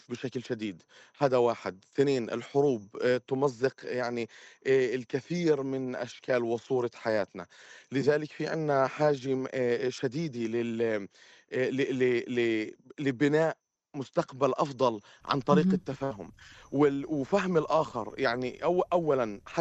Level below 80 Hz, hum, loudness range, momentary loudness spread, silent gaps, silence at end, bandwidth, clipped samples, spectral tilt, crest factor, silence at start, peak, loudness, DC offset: -68 dBFS; none; 2 LU; 10 LU; none; 0 s; 8.2 kHz; under 0.1%; -6.5 dB/octave; 20 dB; 0.1 s; -10 dBFS; -30 LUFS; under 0.1%